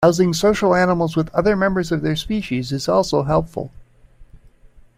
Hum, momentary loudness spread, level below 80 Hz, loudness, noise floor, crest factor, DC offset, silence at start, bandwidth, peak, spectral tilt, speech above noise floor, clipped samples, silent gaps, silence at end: none; 7 LU; -40 dBFS; -19 LUFS; -47 dBFS; 18 dB; under 0.1%; 0 s; 16 kHz; -2 dBFS; -6 dB/octave; 29 dB; under 0.1%; none; 0.75 s